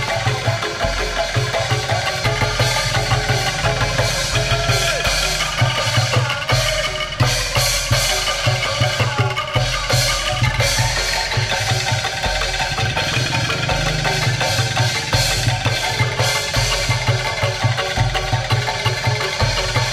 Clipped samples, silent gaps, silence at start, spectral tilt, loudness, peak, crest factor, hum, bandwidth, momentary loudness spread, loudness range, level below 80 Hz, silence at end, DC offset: under 0.1%; none; 0 s; -3 dB/octave; -18 LUFS; -4 dBFS; 14 dB; none; 16 kHz; 3 LU; 1 LU; -30 dBFS; 0 s; under 0.1%